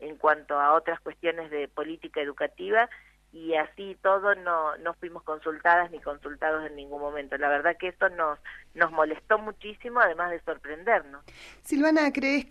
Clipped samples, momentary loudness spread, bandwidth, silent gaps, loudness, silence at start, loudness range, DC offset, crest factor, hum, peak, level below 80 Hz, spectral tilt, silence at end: under 0.1%; 13 LU; 13 kHz; none; -27 LUFS; 0 s; 2 LU; under 0.1%; 20 dB; none; -6 dBFS; -60 dBFS; -4.5 dB/octave; 0.05 s